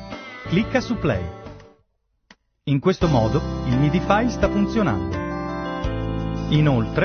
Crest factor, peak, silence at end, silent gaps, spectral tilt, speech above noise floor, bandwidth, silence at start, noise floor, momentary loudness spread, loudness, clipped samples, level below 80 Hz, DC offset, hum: 18 dB; -4 dBFS; 0 s; none; -7.5 dB/octave; 49 dB; 6.6 kHz; 0 s; -68 dBFS; 10 LU; -22 LUFS; under 0.1%; -34 dBFS; under 0.1%; none